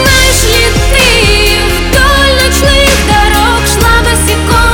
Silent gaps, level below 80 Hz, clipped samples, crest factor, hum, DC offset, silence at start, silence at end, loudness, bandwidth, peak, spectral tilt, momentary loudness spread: none; -12 dBFS; 0.4%; 6 dB; none; 0.5%; 0 s; 0 s; -7 LUFS; over 20 kHz; 0 dBFS; -3 dB/octave; 3 LU